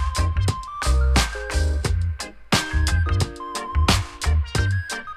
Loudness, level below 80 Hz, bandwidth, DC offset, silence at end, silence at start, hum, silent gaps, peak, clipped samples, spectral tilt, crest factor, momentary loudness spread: -23 LUFS; -24 dBFS; 14.5 kHz; under 0.1%; 0 s; 0 s; none; none; 0 dBFS; under 0.1%; -4.5 dB/octave; 20 dB; 7 LU